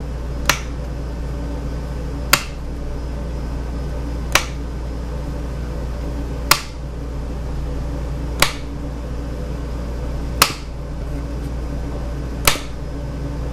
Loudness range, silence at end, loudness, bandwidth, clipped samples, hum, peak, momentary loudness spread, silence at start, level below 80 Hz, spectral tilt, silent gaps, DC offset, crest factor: 3 LU; 0 s; -23 LUFS; 14.5 kHz; under 0.1%; 60 Hz at -40 dBFS; 0 dBFS; 11 LU; 0 s; -26 dBFS; -3.5 dB/octave; none; under 0.1%; 22 dB